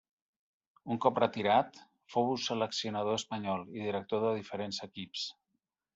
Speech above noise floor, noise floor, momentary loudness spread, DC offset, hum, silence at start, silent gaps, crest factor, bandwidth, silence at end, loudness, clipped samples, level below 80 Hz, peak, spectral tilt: 51 dB; -84 dBFS; 11 LU; under 0.1%; none; 0.85 s; none; 22 dB; 8.2 kHz; 0.65 s; -34 LUFS; under 0.1%; -76 dBFS; -12 dBFS; -4.5 dB/octave